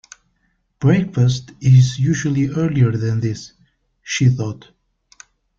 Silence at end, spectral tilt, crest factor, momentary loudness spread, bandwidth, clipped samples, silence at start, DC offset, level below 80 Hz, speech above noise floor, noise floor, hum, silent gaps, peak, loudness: 1 s; -6.5 dB/octave; 16 dB; 12 LU; 7.6 kHz; under 0.1%; 0.8 s; under 0.1%; -48 dBFS; 50 dB; -66 dBFS; none; none; -2 dBFS; -17 LUFS